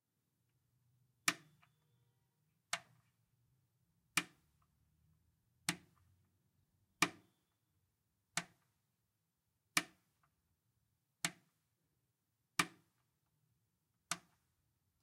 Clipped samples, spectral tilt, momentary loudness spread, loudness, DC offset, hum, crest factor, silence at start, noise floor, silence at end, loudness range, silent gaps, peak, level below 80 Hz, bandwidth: under 0.1%; -1 dB/octave; 11 LU; -41 LUFS; under 0.1%; none; 34 dB; 1.25 s; -86 dBFS; 0.85 s; 3 LU; none; -16 dBFS; -84 dBFS; 15.5 kHz